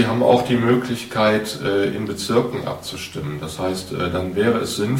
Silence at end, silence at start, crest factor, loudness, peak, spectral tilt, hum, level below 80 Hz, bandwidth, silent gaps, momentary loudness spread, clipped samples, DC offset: 0 s; 0 s; 18 dB; -21 LUFS; -2 dBFS; -5.5 dB/octave; none; -48 dBFS; 16.5 kHz; none; 12 LU; under 0.1%; under 0.1%